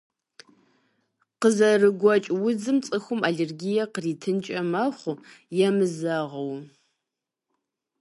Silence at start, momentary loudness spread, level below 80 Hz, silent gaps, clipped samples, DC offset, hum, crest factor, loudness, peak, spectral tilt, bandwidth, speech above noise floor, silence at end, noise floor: 1.4 s; 13 LU; -76 dBFS; none; under 0.1%; under 0.1%; none; 18 dB; -24 LUFS; -6 dBFS; -5.5 dB/octave; 11.5 kHz; 62 dB; 1.35 s; -86 dBFS